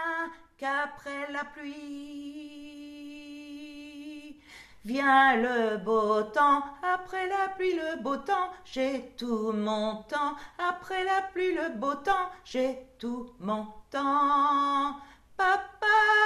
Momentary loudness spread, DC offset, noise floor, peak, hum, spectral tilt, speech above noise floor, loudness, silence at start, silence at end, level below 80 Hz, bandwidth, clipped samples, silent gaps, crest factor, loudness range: 20 LU; under 0.1%; -52 dBFS; -10 dBFS; none; -4.5 dB/octave; 24 dB; -28 LUFS; 0 s; 0 s; -62 dBFS; 13.5 kHz; under 0.1%; none; 18 dB; 11 LU